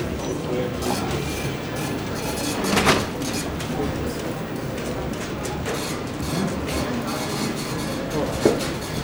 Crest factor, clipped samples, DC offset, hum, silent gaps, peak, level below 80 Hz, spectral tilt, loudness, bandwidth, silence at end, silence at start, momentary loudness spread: 22 dB; under 0.1%; under 0.1%; none; none; -2 dBFS; -40 dBFS; -4.5 dB/octave; -25 LUFS; over 20 kHz; 0 s; 0 s; 7 LU